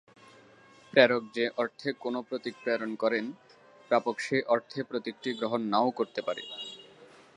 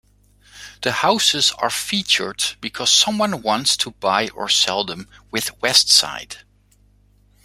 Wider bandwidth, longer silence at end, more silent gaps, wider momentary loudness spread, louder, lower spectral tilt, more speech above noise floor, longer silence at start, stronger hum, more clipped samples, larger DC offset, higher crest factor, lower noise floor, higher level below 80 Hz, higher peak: second, 11 kHz vs 16 kHz; second, 0.3 s vs 1.05 s; neither; about the same, 13 LU vs 13 LU; second, -30 LUFS vs -17 LUFS; first, -5 dB/octave vs -1 dB/octave; second, 27 dB vs 36 dB; first, 0.95 s vs 0.55 s; second, none vs 50 Hz at -50 dBFS; neither; neither; first, 26 dB vs 20 dB; about the same, -57 dBFS vs -56 dBFS; second, -82 dBFS vs -56 dBFS; second, -4 dBFS vs 0 dBFS